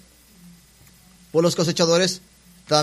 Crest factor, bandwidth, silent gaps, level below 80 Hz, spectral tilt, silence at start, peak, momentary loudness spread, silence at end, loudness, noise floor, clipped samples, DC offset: 22 dB; 15 kHz; none; -60 dBFS; -4 dB/octave; 1.35 s; 0 dBFS; 7 LU; 0 s; -20 LUFS; -52 dBFS; under 0.1%; under 0.1%